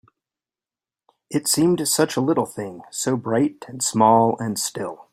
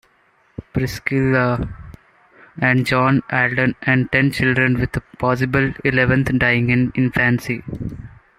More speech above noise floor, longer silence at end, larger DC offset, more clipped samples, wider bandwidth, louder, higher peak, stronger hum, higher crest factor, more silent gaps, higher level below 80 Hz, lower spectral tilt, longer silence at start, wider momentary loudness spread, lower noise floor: first, over 69 dB vs 40 dB; second, 0.1 s vs 0.3 s; neither; neither; about the same, 16 kHz vs 15 kHz; second, -21 LUFS vs -18 LUFS; about the same, -2 dBFS vs -2 dBFS; neither; about the same, 20 dB vs 18 dB; neither; second, -62 dBFS vs -40 dBFS; second, -4 dB/octave vs -7 dB/octave; first, 1.3 s vs 0.6 s; about the same, 12 LU vs 13 LU; first, under -90 dBFS vs -58 dBFS